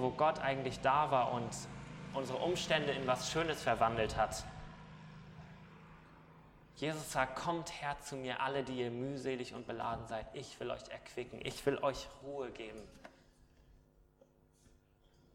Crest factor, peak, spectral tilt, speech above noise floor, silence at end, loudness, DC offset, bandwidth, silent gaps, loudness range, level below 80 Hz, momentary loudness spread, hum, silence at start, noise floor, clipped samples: 22 dB; -16 dBFS; -4.5 dB/octave; 31 dB; 1.6 s; -38 LUFS; under 0.1%; 16.5 kHz; none; 8 LU; -60 dBFS; 21 LU; none; 0 s; -68 dBFS; under 0.1%